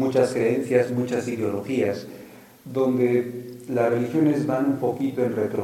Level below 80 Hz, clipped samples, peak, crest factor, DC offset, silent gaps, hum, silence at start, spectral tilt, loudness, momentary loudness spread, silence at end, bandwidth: -68 dBFS; under 0.1%; -6 dBFS; 18 dB; under 0.1%; none; none; 0 s; -7 dB/octave; -24 LUFS; 10 LU; 0 s; 16.5 kHz